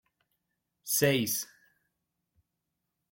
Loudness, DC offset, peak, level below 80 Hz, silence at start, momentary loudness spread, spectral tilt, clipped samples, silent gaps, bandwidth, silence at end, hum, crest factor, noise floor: -28 LUFS; under 0.1%; -12 dBFS; -72 dBFS; 0.85 s; 19 LU; -3.5 dB/octave; under 0.1%; none; 16.5 kHz; 1.65 s; none; 24 dB; -84 dBFS